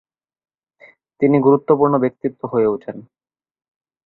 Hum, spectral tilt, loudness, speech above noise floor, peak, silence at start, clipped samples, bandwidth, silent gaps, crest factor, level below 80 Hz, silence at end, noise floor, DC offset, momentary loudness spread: none; -12.5 dB/octave; -17 LUFS; 34 dB; -2 dBFS; 1.2 s; under 0.1%; 4.1 kHz; none; 18 dB; -60 dBFS; 1.05 s; -50 dBFS; under 0.1%; 13 LU